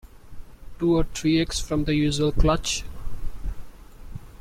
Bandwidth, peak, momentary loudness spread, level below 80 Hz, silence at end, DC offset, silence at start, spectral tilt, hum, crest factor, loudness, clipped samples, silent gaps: 15 kHz; -6 dBFS; 20 LU; -32 dBFS; 0.05 s; under 0.1%; 0.05 s; -5 dB/octave; none; 20 dB; -24 LUFS; under 0.1%; none